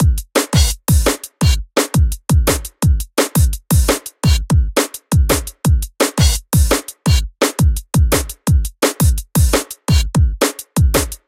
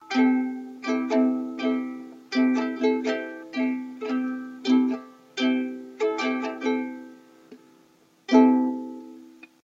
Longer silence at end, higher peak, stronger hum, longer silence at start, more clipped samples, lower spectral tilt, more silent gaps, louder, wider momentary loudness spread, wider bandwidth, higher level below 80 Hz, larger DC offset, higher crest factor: second, 0.1 s vs 0.4 s; first, 0 dBFS vs -4 dBFS; neither; about the same, 0 s vs 0 s; neither; about the same, -4.5 dB/octave vs -4.5 dB/octave; neither; first, -16 LUFS vs -25 LUFS; second, 3 LU vs 14 LU; first, 16.5 kHz vs 7.6 kHz; first, -18 dBFS vs -86 dBFS; neither; second, 14 dB vs 22 dB